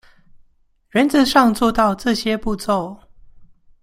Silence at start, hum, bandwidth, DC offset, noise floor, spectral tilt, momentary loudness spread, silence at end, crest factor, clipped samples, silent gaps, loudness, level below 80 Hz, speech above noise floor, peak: 0.95 s; none; 16 kHz; under 0.1%; -57 dBFS; -4.5 dB/octave; 9 LU; 0.4 s; 18 dB; under 0.1%; none; -17 LUFS; -42 dBFS; 41 dB; -2 dBFS